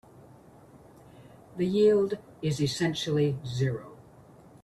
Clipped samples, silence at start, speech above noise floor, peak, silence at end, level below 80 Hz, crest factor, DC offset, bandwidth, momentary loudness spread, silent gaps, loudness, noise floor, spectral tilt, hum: under 0.1%; 0.75 s; 27 dB; -12 dBFS; 0.6 s; -62 dBFS; 18 dB; under 0.1%; 13 kHz; 13 LU; none; -28 LUFS; -53 dBFS; -6 dB/octave; none